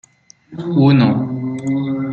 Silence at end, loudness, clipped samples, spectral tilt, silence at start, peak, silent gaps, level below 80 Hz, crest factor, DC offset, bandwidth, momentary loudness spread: 0 s; -16 LUFS; under 0.1%; -8.5 dB/octave; 0.5 s; -2 dBFS; none; -54 dBFS; 14 dB; under 0.1%; 8.2 kHz; 14 LU